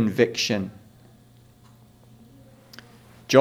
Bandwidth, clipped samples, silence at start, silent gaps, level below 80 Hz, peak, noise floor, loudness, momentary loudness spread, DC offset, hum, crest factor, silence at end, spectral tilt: 19.5 kHz; under 0.1%; 0 s; none; -64 dBFS; -2 dBFS; -53 dBFS; -23 LUFS; 26 LU; under 0.1%; none; 24 dB; 0 s; -4.5 dB/octave